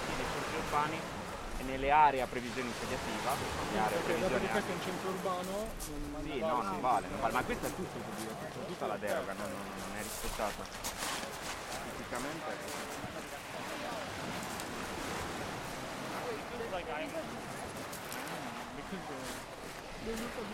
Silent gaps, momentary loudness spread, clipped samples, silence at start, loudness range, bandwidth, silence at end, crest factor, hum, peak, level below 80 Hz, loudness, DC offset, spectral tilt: none; 9 LU; under 0.1%; 0 s; 7 LU; 16.5 kHz; 0 s; 22 dB; none; -14 dBFS; -52 dBFS; -37 LUFS; under 0.1%; -4 dB/octave